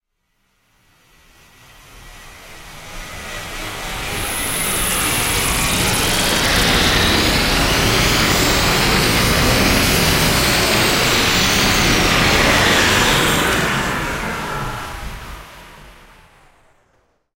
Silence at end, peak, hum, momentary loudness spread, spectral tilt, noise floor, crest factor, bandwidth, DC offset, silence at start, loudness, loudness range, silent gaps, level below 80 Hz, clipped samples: 1.45 s; 0 dBFS; none; 16 LU; -3 dB/octave; -67 dBFS; 18 dB; 16 kHz; under 0.1%; 1.95 s; -14 LUFS; 14 LU; none; -28 dBFS; under 0.1%